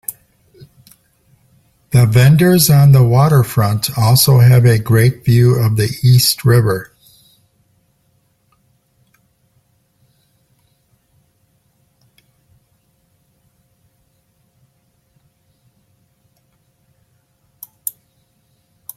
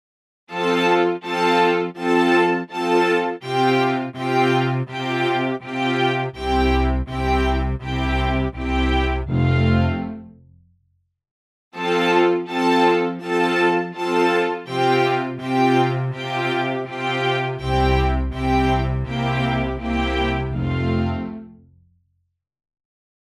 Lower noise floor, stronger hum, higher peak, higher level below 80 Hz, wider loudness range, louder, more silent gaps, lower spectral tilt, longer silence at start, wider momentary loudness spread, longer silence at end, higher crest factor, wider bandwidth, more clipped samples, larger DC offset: second, -61 dBFS vs -71 dBFS; neither; first, 0 dBFS vs -4 dBFS; second, -46 dBFS vs -30 dBFS; first, 25 LU vs 4 LU; first, -11 LUFS vs -20 LUFS; second, none vs 11.31-11.71 s; about the same, -5.5 dB/octave vs -6.5 dB/octave; second, 0.1 s vs 0.5 s; first, 16 LU vs 7 LU; first, 12.1 s vs 1.85 s; about the same, 16 dB vs 16 dB; first, 16 kHz vs 13 kHz; neither; neither